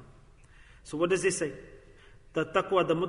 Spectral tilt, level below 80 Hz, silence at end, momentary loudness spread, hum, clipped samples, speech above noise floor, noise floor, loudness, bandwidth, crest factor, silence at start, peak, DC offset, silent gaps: -4.5 dB/octave; -56 dBFS; 0 s; 12 LU; none; under 0.1%; 27 dB; -55 dBFS; -29 LUFS; 11 kHz; 20 dB; 0 s; -12 dBFS; under 0.1%; none